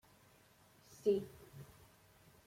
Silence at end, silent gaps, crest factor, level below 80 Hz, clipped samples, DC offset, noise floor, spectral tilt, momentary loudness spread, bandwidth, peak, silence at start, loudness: 0.85 s; none; 22 dB; -74 dBFS; under 0.1%; under 0.1%; -67 dBFS; -6.5 dB/octave; 25 LU; 16.5 kHz; -22 dBFS; 1.05 s; -39 LUFS